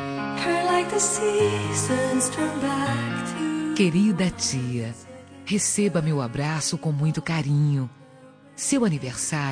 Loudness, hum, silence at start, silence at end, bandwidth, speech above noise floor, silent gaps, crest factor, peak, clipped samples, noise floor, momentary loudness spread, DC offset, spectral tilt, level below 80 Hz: -24 LUFS; none; 0 s; 0 s; 10.5 kHz; 25 dB; none; 16 dB; -8 dBFS; under 0.1%; -49 dBFS; 8 LU; under 0.1%; -4.5 dB/octave; -56 dBFS